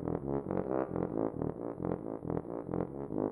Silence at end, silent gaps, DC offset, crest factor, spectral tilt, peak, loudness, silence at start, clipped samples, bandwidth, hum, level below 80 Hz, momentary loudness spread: 0 s; none; under 0.1%; 18 dB; -11.5 dB/octave; -18 dBFS; -37 LUFS; 0 s; under 0.1%; 3.7 kHz; none; -56 dBFS; 4 LU